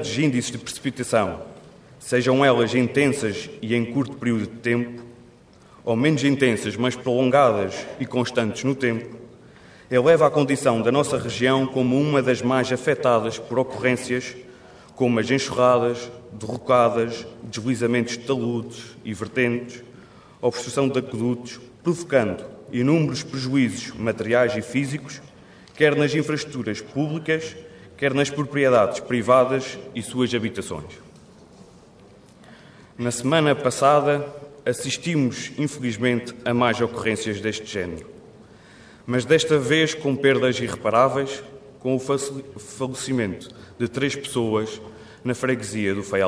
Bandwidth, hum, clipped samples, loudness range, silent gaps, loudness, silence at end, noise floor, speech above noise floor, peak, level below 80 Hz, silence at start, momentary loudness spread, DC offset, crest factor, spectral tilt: 11 kHz; none; under 0.1%; 5 LU; none; -22 LUFS; 0 s; -50 dBFS; 28 dB; -4 dBFS; -58 dBFS; 0 s; 14 LU; under 0.1%; 20 dB; -5.5 dB/octave